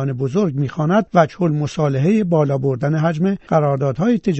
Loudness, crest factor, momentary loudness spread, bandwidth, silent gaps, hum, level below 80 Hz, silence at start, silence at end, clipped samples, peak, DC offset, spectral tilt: -18 LUFS; 16 dB; 4 LU; 8.2 kHz; none; none; -50 dBFS; 0 s; 0 s; under 0.1%; 0 dBFS; under 0.1%; -8.5 dB/octave